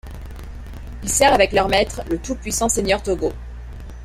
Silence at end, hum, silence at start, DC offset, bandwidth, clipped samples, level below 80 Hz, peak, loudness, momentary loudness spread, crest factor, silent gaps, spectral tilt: 0 s; none; 0.05 s; under 0.1%; 16 kHz; under 0.1%; -32 dBFS; -2 dBFS; -19 LUFS; 22 LU; 18 dB; none; -3 dB/octave